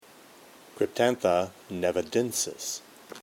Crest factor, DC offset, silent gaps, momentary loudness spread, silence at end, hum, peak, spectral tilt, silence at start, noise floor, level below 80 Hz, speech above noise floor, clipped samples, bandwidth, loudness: 20 dB; under 0.1%; none; 10 LU; 0.05 s; none; -10 dBFS; -3.5 dB/octave; 0.75 s; -53 dBFS; -66 dBFS; 25 dB; under 0.1%; 17.5 kHz; -28 LUFS